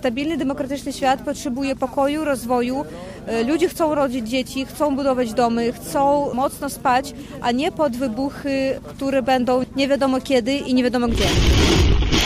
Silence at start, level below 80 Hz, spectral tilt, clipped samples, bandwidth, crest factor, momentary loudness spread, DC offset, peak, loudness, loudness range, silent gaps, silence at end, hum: 0 s; -30 dBFS; -5 dB/octave; under 0.1%; 16 kHz; 14 dB; 7 LU; under 0.1%; -6 dBFS; -20 LUFS; 3 LU; none; 0 s; none